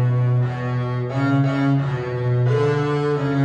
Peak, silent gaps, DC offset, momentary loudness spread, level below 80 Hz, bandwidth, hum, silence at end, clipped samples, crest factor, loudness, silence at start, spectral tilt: -8 dBFS; none; under 0.1%; 5 LU; -54 dBFS; 7.4 kHz; none; 0 s; under 0.1%; 12 dB; -20 LUFS; 0 s; -9 dB/octave